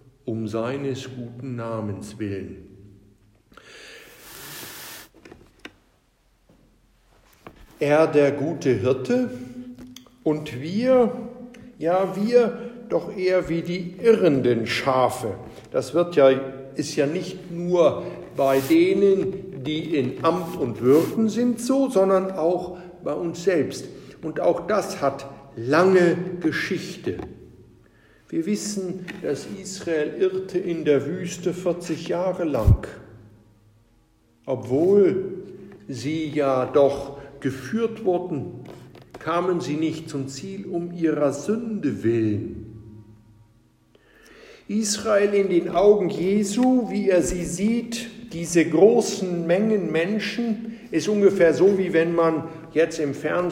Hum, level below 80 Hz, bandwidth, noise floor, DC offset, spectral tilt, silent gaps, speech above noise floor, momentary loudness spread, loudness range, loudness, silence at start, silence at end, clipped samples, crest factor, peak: none; -44 dBFS; 16 kHz; -62 dBFS; under 0.1%; -6 dB/octave; none; 41 dB; 17 LU; 9 LU; -23 LUFS; 0.25 s; 0 s; under 0.1%; 20 dB; -4 dBFS